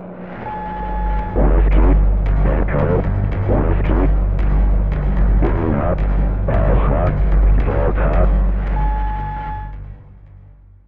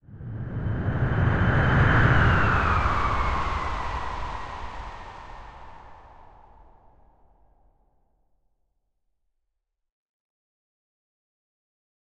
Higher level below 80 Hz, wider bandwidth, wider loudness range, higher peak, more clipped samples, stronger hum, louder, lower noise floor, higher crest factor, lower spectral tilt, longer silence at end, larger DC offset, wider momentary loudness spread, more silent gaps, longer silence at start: first, -16 dBFS vs -34 dBFS; second, 3.5 kHz vs 8.4 kHz; second, 2 LU vs 20 LU; about the same, -4 dBFS vs -6 dBFS; neither; neither; first, -18 LUFS vs -24 LUFS; second, -43 dBFS vs -80 dBFS; second, 12 dB vs 22 dB; first, -11 dB/octave vs -7.5 dB/octave; second, 0.15 s vs 5.75 s; first, 0.9% vs under 0.1%; second, 10 LU vs 22 LU; neither; about the same, 0 s vs 0.1 s